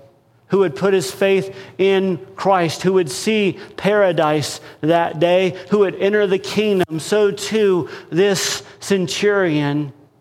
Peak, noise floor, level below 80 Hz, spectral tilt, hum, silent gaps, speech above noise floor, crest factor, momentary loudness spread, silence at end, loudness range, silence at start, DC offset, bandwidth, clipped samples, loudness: -2 dBFS; -51 dBFS; -60 dBFS; -5 dB/octave; none; none; 33 dB; 14 dB; 6 LU; 0.3 s; 1 LU; 0.5 s; under 0.1%; 16 kHz; under 0.1%; -18 LUFS